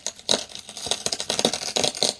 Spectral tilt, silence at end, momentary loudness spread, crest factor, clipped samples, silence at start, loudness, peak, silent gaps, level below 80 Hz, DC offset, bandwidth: -1 dB/octave; 0 s; 7 LU; 26 dB; under 0.1%; 0 s; -24 LUFS; 0 dBFS; none; -60 dBFS; under 0.1%; 11 kHz